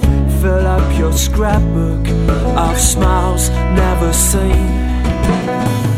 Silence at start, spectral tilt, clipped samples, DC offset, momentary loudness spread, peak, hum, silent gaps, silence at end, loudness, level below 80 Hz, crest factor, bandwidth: 0 s; -5 dB/octave; under 0.1%; under 0.1%; 4 LU; 0 dBFS; none; none; 0 s; -14 LUFS; -16 dBFS; 12 dB; 16 kHz